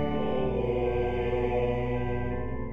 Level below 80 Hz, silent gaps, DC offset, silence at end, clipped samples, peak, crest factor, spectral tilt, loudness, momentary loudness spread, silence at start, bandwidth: -38 dBFS; none; 1%; 0 s; under 0.1%; -16 dBFS; 12 dB; -9.5 dB/octave; -29 LUFS; 4 LU; 0 s; 6.4 kHz